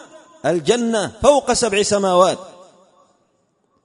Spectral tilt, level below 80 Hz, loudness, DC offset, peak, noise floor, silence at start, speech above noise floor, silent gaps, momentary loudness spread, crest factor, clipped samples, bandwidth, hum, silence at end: -3.5 dB/octave; -48 dBFS; -17 LUFS; under 0.1%; 0 dBFS; -64 dBFS; 0.45 s; 48 dB; none; 7 LU; 18 dB; under 0.1%; 11 kHz; none; 1.35 s